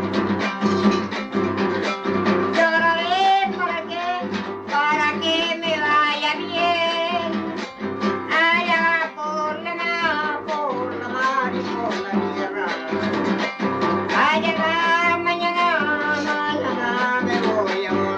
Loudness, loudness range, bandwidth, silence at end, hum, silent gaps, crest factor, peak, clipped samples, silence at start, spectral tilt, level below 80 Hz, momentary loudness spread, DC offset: -21 LUFS; 4 LU; 8.6 kHz; 0 s; none; none; 16 dB; -6 dBFS; under 0.1%; 0 s; -5 dB/octave; -62 dBFS; 7 LU; under 0.1%